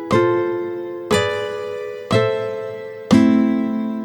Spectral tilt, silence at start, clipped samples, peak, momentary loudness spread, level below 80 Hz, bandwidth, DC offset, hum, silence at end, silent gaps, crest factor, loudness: -6 dB/octave; 0 s; under 0.1%; -2 dBFS; 13 LU; -54 dBFS; 19 kHz; under 0.1%; none; 0 s; none; 18 dB; -19 LUFS